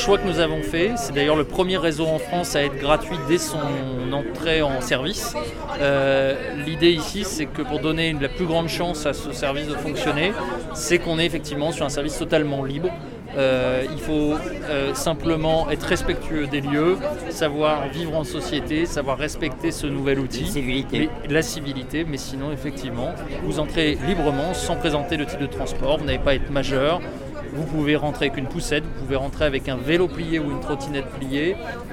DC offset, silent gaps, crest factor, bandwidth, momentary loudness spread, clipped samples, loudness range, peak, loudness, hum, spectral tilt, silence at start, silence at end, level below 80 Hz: under 0.1%; none; 18 dB; 17 kHz; 7 LU; under 0.1%; 3 LU; -4 dBFS; -23 LUFS; none; -5 dB/octave; 0 s; 0 s; -34 dBFS